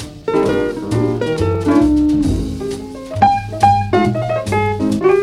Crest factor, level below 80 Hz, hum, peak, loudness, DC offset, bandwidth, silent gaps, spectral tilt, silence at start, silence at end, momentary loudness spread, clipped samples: 16 dB; -32 dBFS; none; 0 dBFS; -16 LUFS; under 0.1%; 13 kHz; none; -7 dB/octave; 0 s; 0 s; 8 LU; under 0.1%